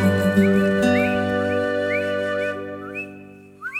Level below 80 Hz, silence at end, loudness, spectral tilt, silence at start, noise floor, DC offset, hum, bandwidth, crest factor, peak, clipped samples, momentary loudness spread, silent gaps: -54 dBFS; 0 s; -21 LUFS; -6.5 dB/octave; 0 s; -42 dBFS; under 0.1%; 50 Hz at -60 dBFS; 15 kHz; 16 dB; -6 dBFS; under 0.1%; 14 LU; none